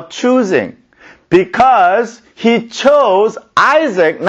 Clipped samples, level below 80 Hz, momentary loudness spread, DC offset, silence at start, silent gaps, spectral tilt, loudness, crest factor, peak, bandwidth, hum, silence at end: under 0.1%; -52 dBFS; 7 LU; under 0.1%; 0 s; none; -5 dB/octave; -12 LUFS; 12 dB; 0 dBFS; 8.4 kHz; none; 0 s